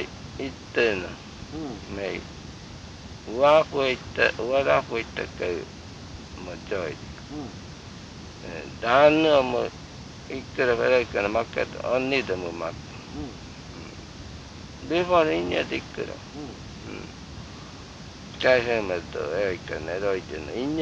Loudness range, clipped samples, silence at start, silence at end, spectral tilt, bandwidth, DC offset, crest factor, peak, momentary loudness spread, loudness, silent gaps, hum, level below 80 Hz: 8 LU; under 0.1%; 0 s; 0 s; -5 dB/octave; 8.6 kHz; under 0.1%; 22 dB; -4 dBFS; 20 LU; -25 LUFS; none; none; -50 dBFS